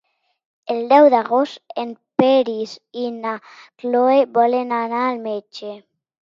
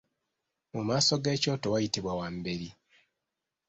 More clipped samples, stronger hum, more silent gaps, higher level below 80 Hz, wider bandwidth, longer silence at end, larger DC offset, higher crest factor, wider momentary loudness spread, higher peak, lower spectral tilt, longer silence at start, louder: neither; neither; neither; second, -70 dBFS vs -60 dBFS; second, 7.4 kHz vs 8.4 kHz; second, 0.45 s vs 0.95 s; neither; about the same, 18 dB vs 20 dB; first, 17 LU vs 13 LU; first, 0 dBFS vs -14 dBFS; first, -6 dB/octave vs -4 dB/octave; about the same, 0.65 s vs 0.75 s; first, -18 LUFS vs -30 LUFS